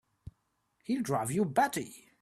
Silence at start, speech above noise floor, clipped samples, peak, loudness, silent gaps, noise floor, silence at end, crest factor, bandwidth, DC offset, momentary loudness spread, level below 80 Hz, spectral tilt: 0.9 s; 46 dB; under 0.1%; -14 dBFS; -31 LUFS; none; -77 dBFS; 0.2 s; 18 dB; 15.5 kHz; under 0.1%; 15 LU; -66 dBFS; -5 dB/octave